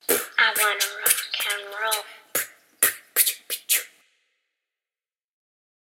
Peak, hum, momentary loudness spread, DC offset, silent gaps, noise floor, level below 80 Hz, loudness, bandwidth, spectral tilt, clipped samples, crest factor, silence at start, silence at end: 0 dBFS; none; 9 LU; under 0.1%; none; under -90 dBFS; -82 dBFS; -22 LUFS; 16.5 kHz; 2 dB/octave; under 0.1%; 26 dB; 0.1 s; 2 s